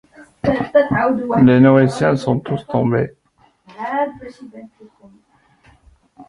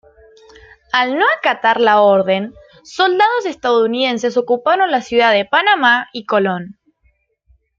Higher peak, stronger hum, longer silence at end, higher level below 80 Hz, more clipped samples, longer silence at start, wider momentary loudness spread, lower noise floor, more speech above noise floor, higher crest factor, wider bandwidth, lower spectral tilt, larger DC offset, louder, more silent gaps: about the same, -2 dBFS vs 0 dBFS; neither; second, 0.05 s vs 1.05 s; first, -48 dBFS vs -58 dBFS; neither; second, 0.2 s vs 0.95 s; first, 17 LU vs 8 LU; about the same, -57 dBFS vs -60 dBFS; second, 41 dB vs 46 dB; about the same, 16 dB vs 16 dB; first, 11 kHz vs 7.6 kHz; first, -8 dB/octave vs -4.5 dB/octave; neither; about the same, -16 LUFS vs -14 LUFS; neither